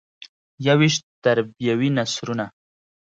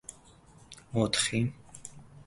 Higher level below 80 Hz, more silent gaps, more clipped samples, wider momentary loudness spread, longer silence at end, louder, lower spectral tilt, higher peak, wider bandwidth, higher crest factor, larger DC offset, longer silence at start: second, -64 dBFS vs -58 dBFS; first, 1.03-1.22 s vs none; neither; second, 10 LU vs 22 LU; first, 0.6 s vs 0.05 s; first, -21 LUFS vs -30 LUFS; about the same, -5 dB/octave vs -4 dB/octave; first, -4 dBFS vs -12 dBFS; second, 9 kHz vs 11.5 kHz; about the same, 18 dB vs 22 dB; neither; first, 0.6 s vs 0.1 s